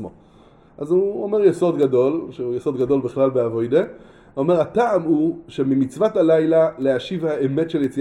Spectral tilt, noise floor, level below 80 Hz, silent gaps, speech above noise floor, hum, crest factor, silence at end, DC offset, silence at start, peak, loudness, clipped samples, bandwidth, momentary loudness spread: -8 dB/octave; -50 dBFS; -56 dBFS; none; 31 dB; none; 16 dB; 0 s; under 0.1%; 0 s; -4 dBFS; -19 LUFS; under 0.1%; 11.5 kHz; 8 LU